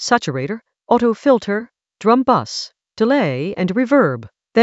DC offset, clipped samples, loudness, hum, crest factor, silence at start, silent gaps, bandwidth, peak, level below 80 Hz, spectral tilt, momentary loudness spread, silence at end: under 0.1%; under 0.1%; -17 LUFS; none; 18 dB; 0 s; none; 8.2 kHz; 0 dBFS; -58 dBFS; -5.5 dB/octave; 12 LU; 0 s